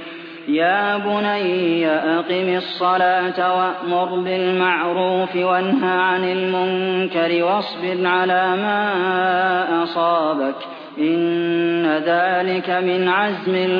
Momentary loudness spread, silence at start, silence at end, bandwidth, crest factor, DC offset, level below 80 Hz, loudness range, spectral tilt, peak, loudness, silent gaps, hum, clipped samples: 4 LU; 0 s; 0 s; 5.2 kHz; 14 dB; under 0.1%; -70 dBFS; 1 LU; -8 dB/octave; -4 dBFS; -19 LUFS; none; none; under 0.1%